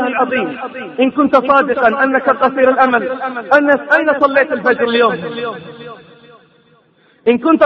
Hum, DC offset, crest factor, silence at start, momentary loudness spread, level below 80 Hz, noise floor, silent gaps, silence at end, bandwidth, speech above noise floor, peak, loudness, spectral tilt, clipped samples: none; under 0.1%; 14 dB; 0 s; 13 LU; -58 dBFS; -52 dBFS; none; 0 s; 6.2 kHz; 39 dB; 0 dBFS; -13 LUFS; -6.5 dB/octave; under 0.1%